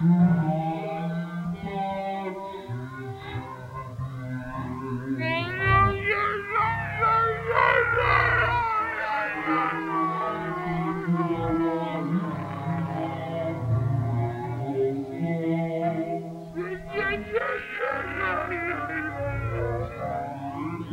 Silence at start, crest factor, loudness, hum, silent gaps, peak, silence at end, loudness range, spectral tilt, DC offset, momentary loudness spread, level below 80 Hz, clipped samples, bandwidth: 0 s; 20 dB; -27 LUFS; none; none; -6 dBFS; 0 s; 10 LU; -8 dB/octave; under 0.1%; 13 LU; -46 dBFS; under 0.1%; 8.8 kHz